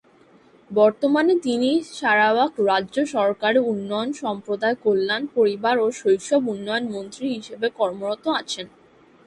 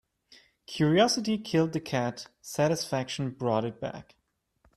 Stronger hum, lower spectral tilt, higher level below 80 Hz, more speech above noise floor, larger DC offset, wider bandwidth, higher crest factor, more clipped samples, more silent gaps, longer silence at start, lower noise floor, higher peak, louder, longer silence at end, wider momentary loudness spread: neither; about the same, -4.5 dB/octave vs -5 dB/octave; about the same, -68 dBFS vs -66 dBFS; second, 32 dB vs 43 dB; neither; second, 11.5 kHz vs 14.5 kHz; about the same, 18 dB vs 20 dB; neither; neither; first, 0.7 s vs 0.3 s; second, -54 dBFS vs -71 dBFS; first, -4 dBFS vs -10 dBFS; first, -22 LUFS vs -28 LUFS; second, 0.6 s vs 0.75 s; second, 10 LU vs 15 LU